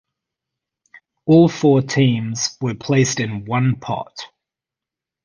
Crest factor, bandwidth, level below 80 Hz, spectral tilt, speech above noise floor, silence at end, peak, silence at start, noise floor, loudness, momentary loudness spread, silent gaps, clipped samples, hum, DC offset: 18 dB; 10 kHz; -54 dBFS; -5.5 dB/octave; 70 dB; 1 s; -2 dBFS; 1.25 s; -87 dBFS; -18 LUFS; 15 LU; none; under 0.1%; none; under 0.1%